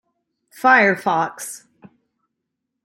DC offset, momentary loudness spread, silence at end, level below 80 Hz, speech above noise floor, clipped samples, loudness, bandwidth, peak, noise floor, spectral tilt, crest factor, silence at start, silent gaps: under 0.1%; 19 LU; 1.25 s; -74 dBFS; 62 dB; under 0.1%; -17 LUFS; 16.5 kHz; -2 dBFS; -79 dBFS; -4 dB/octave; 20 dB; 0.65 s; none